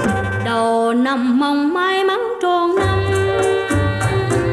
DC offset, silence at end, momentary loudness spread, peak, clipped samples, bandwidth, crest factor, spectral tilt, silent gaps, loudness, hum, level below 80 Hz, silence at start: under 0.1%; 0 s; 3 LU; -8 dBFS; under 0.1%; 13 kHz; 10 dB; -6 dB/octave; none; -17 LUFS; none; -38 dBFS; 0 s